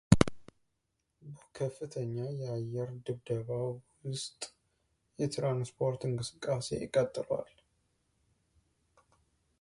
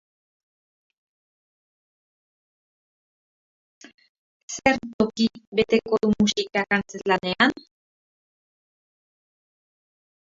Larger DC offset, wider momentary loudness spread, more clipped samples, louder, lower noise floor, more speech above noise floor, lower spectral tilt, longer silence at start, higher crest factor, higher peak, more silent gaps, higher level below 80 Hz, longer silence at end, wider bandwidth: neither; first, 11 LU vs 5 LU; neither; second, -35 LUFS vs -23 LUFS; second, -82 dBFS vs under -90 dBFS; second, 46 dB vs over 67 dB; first, -6 dB/octave vs -4.5 dB/octave; second, 0.1 s vs 4.5 s; about the same, 30 dB vs 26 dB; about the same, -4 dBFS vs -2 dBFS; second, none vs 4.93-4.99 s, 5.47-5.52 s; about the same, -54 dBFS vs -58 dBFS; second, 2.15 s vs 2.65 s; first, 11.5 kHz vs 7.8 kHz